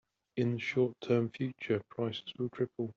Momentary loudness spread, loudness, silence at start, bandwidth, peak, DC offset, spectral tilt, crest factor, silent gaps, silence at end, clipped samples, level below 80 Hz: 7 LU; -35 LUFS; 0.35 s; 7.2 kHz; -16 dBFS; under 0.1%; -6 dB/octave; 18 dB; none; 0.05 s; under 0.1%; -74 dBFS